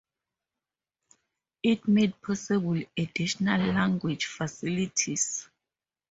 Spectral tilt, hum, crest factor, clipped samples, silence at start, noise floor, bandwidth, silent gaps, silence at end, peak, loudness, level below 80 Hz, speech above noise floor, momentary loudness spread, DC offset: -4.5 dB/octave; none; 20 dB; under 0.1%; 1.65 s; under -90 dBFS; 8 kHz; none; 0.7 s; -10 dBFS; -28 LUFS; -62 dBFS; over 63 dB; 8 LU; under 0.1%